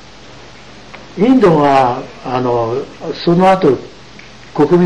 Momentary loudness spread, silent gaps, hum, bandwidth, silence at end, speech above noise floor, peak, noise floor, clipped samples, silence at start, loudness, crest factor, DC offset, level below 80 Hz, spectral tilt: 19 LU; none; none; 10.5 kHz; 0 s; 25 dB; -2 dBFS; -37 dBFS; under 0.1%; 0.75 s; -13 LUFS; 12 dB; 0.9%; -44 dBFS; -7.5 dB/octave